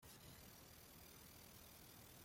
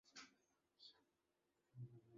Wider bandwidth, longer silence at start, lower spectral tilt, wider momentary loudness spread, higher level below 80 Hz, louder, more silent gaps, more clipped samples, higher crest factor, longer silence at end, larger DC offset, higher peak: first, 16.5 kHz vs 7.4 kHz; about the same, 0 s vs 0.05 s; about the same, -3 dB/octave vs -4 dB/octave; second, 1 LU vs 6 LU; first, -74 dBFS vs under -90 dBFS; about the same, -61 LUFS vs -63 LUFS; neither; neither; second, 14 dB vs 20 dB; about the same, 0 s vs 0 s; neither; about the same, -48 dBFS vs -46 dBFS